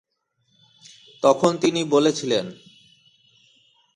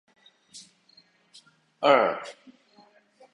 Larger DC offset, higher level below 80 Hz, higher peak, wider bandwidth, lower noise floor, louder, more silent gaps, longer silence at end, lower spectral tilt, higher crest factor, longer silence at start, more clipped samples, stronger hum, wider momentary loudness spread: neither; first, -68 dBFS vs -78 dBFS; about the same, -4 dBFS vs -6 dBFS; about the same, 11.5 kHz vs 11 kHz; first, -70 dBFS vs -61 dBFS; first, -20 LUFS vs -23 LUFS; neither; first, 1.4 s vs 1 s; about the same, -4.5 dB/octave vs -4 dB/octave; about the same, 20 dB vs 24 dB; first, 1.2 s vs 0.55 s; neither; neither; second, 7 LU vs 27 LU